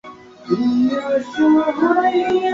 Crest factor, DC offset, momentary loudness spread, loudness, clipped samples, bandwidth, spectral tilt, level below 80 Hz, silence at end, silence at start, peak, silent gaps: 14 dB; under 0.1%; 6 LU; -17 LUFS; under 0.1%; 7.6 kHz; -6.5 dB/octave; -58 dBFS; 0 s; 0.05 s; -4 dBFS; none